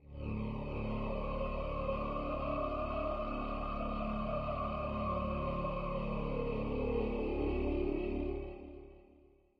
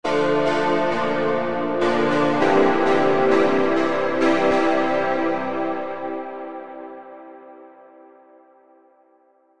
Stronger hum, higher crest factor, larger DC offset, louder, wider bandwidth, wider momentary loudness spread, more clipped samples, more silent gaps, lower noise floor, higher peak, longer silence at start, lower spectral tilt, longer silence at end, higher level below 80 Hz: neither; about the same, 14 dB vs 16 dB; neither; second, -38 LUFS vs -20 LUFS; second, 5.2 kHz vs 10 kHz; second, 5 LU vs 17 LU; neither; neither; first, -64 dBFS vs -58 dBFS; second, -24 dBFS vs -6 dBFS; about the same, 0 s vs 0 s; first, -9.5 dB/octave vs -6 dB/octave; first, 0.4 s vs 0 s; first, -42 dBFS vs -62 dBFS